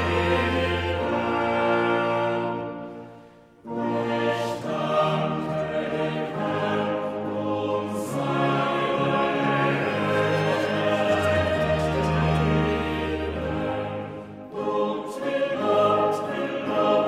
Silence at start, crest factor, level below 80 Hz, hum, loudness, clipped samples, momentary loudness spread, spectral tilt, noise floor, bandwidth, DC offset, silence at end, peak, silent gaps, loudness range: 0 s; 16 dB; -44 dBFS; none; -25 LUFS; under 0.1%; 7 LU; -6.5 dB/octave; -49 dBFS; 15 kHz; under 0.1%; 0 s; -10 dBFS; none; 4 LU